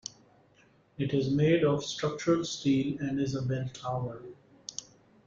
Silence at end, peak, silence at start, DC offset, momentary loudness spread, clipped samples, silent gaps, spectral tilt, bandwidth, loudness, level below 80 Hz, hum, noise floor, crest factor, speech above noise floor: 0.45 s; -14 dBFS; 1 s; under 0.1%; 17 LU; under 0.1%; none; -6 dB/octave; 7.6 kHz; -30 LUFS; -62 dBFS; none; -63 dBFS; 18 dB; 34 dB